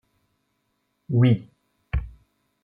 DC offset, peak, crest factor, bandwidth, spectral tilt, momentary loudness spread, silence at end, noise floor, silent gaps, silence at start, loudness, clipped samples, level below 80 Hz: under 0.1%; -8 dBFS; 18 dB; 3.7 kHz; -10.5 dB/octave; 12 LU; 0.55 s; -74 dBFS; none; 1.1 s; -24 LUFS; under 0.1%; -38 dBFS